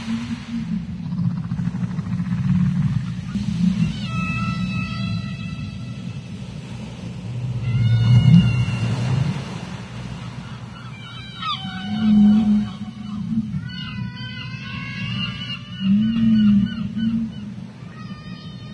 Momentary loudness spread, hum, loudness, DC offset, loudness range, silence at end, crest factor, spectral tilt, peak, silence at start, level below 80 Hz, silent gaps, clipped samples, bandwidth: 18 LU; none; -22 LUFS; under 0.1%; 8 LU; 0 s; 20 dB; -7.5 dB/octave; -2 dBFS; 0 s; -42 dBFS; none; under 0.1%; 10 kHz